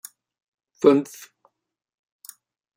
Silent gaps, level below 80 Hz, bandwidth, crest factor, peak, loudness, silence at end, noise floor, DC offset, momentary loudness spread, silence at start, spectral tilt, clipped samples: none; -80 dBFS; 16.5 kHz; 24 dB; -2 dBFS; -20 LUFS; 1.75 s; -74 dBFS; under 0.1%; 26 LU; 0.85 s; -6 dB/octave; under 0.1%